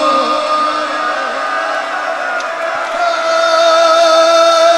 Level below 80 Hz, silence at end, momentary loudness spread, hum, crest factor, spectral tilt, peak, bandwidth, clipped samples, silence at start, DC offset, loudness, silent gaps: -60 dBFS; 0 s; 9 LU; none; 12 dB; -0.5 dB/octave; 0 dBFS; 13.5 kHz; under 0.1%; 0 s; under 0.1%; -12 LUFS; none